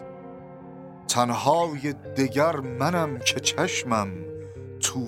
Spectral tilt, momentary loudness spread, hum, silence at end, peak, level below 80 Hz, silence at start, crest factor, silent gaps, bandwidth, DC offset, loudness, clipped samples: -3.5 dB/octave; 20 LU; none; 0 s; -6 dBFS; -62 dBFS; 0 s; 22 dB; none; 16.5 kHz; under 0.1%; -25 LUFS; under 0.1%